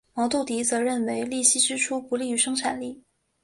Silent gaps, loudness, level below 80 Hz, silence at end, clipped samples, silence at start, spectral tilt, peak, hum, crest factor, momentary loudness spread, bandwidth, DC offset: none; -24 LUFS; -66 dBFS; 0.5 s; under 0.1%; 0.15 s; -1 dB/octave; -6 dBFS; none; 20 dB; 9 LU; 11.5 kHz; under 0.1%